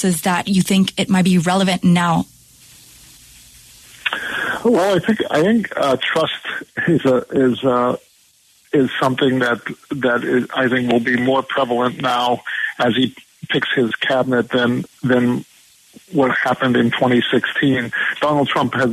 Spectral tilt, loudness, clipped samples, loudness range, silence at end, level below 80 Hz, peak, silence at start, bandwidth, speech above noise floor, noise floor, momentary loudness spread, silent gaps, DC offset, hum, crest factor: -5.5 dB/octave; -17 LUFS; under 0.1%; 2 LU; 0 s; -54 dBFS; -2 dBFS; 0 s; 13.5 kHz; 37 dB; -54 dBFS; 6 LU; none; under 0.1%; none; 16 dB